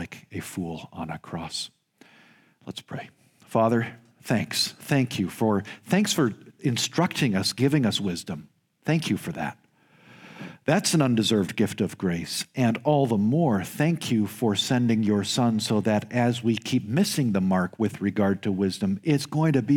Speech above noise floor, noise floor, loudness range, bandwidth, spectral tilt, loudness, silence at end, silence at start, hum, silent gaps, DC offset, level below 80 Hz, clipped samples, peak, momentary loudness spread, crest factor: 33 dB; -57 dBFS; 5 LU; 18 kHz; -5 dB/octave; -25 LUFS; 0 s; 0 s; none; none; under 0.1%; -64 dBFS; under 0.1%; -6 dBFS; 13 LU; 18 dB